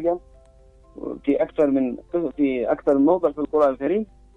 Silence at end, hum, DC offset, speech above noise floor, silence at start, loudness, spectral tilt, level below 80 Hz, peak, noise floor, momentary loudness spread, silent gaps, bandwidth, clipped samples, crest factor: 0.3 s; none; under 0.1%; 30 dB; 0 s; -22 LUFS; -8.5 dB/octave; -52 dBFS; -6 dBFS; -51 dBFS; 9 LU; none; 4 kHz; under 0.1%; 16 dB